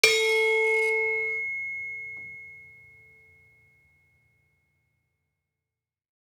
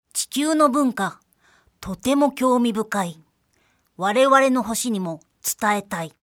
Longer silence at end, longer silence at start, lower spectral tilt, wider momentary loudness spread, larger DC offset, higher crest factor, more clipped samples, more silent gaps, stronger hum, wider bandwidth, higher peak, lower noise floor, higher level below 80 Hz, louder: first, 3.65 s vs 0.25 s; about the same, 0.05 s vs 0.15 s; second, 0.5 dB/octave vs -4 dB/octave; first, 20 LU vs 14 LU; neither; first, 26 dB vs 20 dB; neither; neither; neither; about the same, 18.5 kHz vs 19 kHz; about the same, -2 dBFS vs -2 dBFS; first, -90 dBFS vs -65 dBFS; second, -78 dBFS vs -58 dBFS; second, -24 LUFS vs -21 LUFS